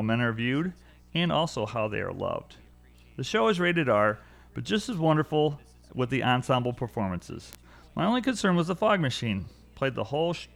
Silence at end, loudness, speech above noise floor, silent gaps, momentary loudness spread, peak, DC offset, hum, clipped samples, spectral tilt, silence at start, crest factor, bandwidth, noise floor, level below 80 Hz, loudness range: 0.1 s; -27 LUFS; 27 dB; none; 14 LU; -10 dBFS; under 0.1%; 60 Hz at -55 dBFS; under 0.1%; -6 dB/octave; 0 s; 18 dB; over 20 kHz; -54 dBFS; -54 dBFS; 2 LU